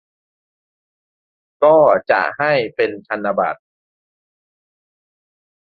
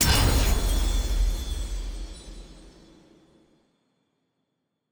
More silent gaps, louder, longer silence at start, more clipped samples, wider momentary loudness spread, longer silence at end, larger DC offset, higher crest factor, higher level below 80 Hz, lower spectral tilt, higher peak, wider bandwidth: neither; first, -16 LUFS vs -26 LUFS; first, 1.6 s vs 0 s; neither; second, 11 LU vs 23 LU; about the same, 2.15 s vs 2.25 s; neither; about the same, 18 dB vs 18 dB; second, -64 dBFS vs -28 dBFS; first, -7.5 dB/octave vs -3.5 dB/octave; first, -2 dBFS vs -10 dBFS; second, 5 kHz vs over 20 kHz